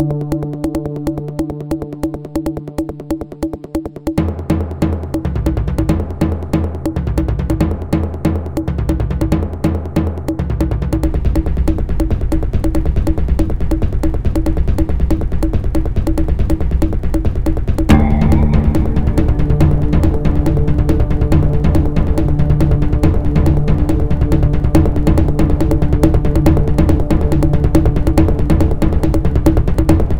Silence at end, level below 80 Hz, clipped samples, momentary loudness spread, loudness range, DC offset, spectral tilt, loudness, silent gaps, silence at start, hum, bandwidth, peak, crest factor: 0 s; -18 dBFS; under 0.1%; 8 LU; 6 LU; 6%; -8.5 dB/octave; -16 LUFS; none; 0 s; none; 16.5 kHz; 0 dBFS; 14 dB